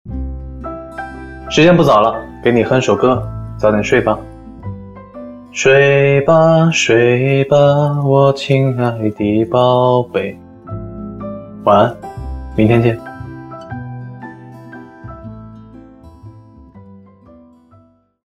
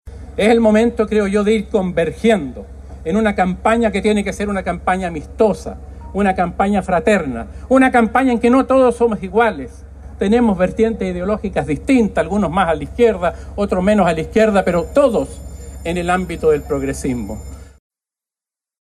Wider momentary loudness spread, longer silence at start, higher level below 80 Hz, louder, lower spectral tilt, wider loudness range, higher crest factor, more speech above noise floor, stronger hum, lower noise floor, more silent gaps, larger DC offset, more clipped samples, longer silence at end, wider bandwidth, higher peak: first, 23 LU vs 13 LU; about the same, 0.05 s vs 0.05 s; about the same, -36 dBFS vs -34 dBFS; first, -13 LUFS vs -16 LUFS; about the same, -6 dB/octave vs -6.5 dB/octave; first, 9 LU vs 3 LU; about the same, 14 dB vs 16 dB; second, 38 dB vs 74 dB; neither; second, -49 dBFS vs -89 dBFS; neither; neither; neither; first, 1.35 s vs 1.1 s; about the same, 12 kHz vs 12.5 kHz; about the same, 0 dBFS vs -2 dBFS